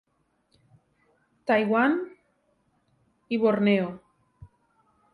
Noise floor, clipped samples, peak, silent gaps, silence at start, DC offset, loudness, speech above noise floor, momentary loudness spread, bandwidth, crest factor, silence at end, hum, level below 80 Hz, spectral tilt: -71 dBFS; under 0.1%; -10 dBFS; none; 1.45 s; under 0.1%; -25 LUFS; 48 dB; 16 LU; 5.2 kHz; 18 dB; 0.7 s; none; -68 dBFS; -8 dB/octave